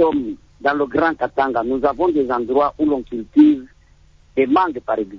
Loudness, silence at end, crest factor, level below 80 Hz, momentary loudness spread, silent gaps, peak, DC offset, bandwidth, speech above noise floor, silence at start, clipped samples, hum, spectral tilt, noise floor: -18 LUFS; 0 s; 16 dB; -48 dBFS; 10 LU; none; -4 dBFS; under 0.1%; 5.8 kHz; 32 dB; 0 s; under 0.1%; none; -7.5 dB/octave; -50 dBFS